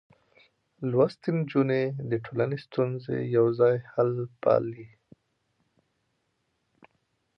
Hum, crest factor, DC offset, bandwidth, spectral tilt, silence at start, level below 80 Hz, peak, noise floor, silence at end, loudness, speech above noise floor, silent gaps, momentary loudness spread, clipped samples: none; 20 dB; under 0.1%; 6 kHz; -10 dB/octave; 0.8 s; -70 dBFS; -10 dBFS; -76 dBFS; 2.5 s; -27 LUFS; 50 dB; none; 7 LU; under 0.1%